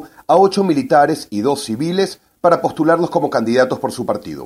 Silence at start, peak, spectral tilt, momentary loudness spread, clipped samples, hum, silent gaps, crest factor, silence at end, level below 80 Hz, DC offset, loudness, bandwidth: 0 s; 0 dBFS; -5.5 dB/octave; 8 LU; under 0.1%; none; none; 16 dB; 0 s; -58 dBFS; under 0.1%; -16 LUFS; 15.5 kHz